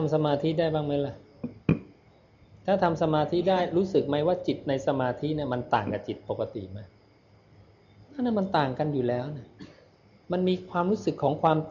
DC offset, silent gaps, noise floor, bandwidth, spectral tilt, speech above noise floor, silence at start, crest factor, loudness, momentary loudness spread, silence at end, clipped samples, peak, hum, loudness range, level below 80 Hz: under 0.1%; none; -59 dBFS; 7.4 kHz; -8 dB/octave; 32 dB; 0 s; 18 dB; -28 LUFS; 11 LU; 0 s; under 0.1%; -10 dBFS; none; 5 LU; -58 dBFS